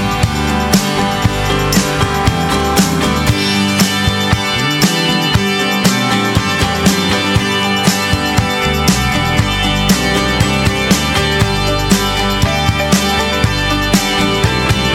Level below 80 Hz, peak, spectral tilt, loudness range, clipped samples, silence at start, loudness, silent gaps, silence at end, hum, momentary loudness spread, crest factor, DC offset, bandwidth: -26 dBFS; 0 dBFS; -4 dB/octave; 0 LU; 0.1%; 0 s; -13 LUFS; none; 0 s; none; 2 LU; 14 dB; under 0.1%; 20 kHz